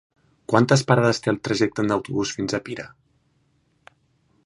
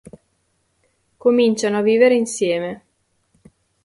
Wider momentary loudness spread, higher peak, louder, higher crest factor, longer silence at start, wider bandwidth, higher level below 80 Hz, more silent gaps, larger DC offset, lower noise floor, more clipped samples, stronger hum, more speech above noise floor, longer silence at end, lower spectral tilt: first, 17 LU vs 11 LU; about the same, -2 dBFS vs -2 dBFS; second, -21 LUFS vs -17 LUFS; about the same, 22 dB vs 18 dB; second, 0.5 s vs 1.25 s; about the same, 11.5 kHz vs 11.5 kHz; first, -58 dBFS vs -64 dBFS; neither; neither; about the same, -65 dBFS vs -67 dBFS; neither; neither; second, 44 dB vs 50 dB; first, 1.6 s vs 1.1 s; about the same, -5.5 dB/octave vs -4.5 dB/octave